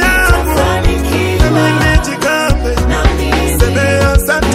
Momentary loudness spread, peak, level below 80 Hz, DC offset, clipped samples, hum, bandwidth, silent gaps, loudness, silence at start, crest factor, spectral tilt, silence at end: 3 LU; 0 dBFS; -16 dBFS; under 0.1%; 0.2%; none; 16.5 kHz; none; -12 LUFS; 0 s; 10 dB; -5 dB/octave; 0 s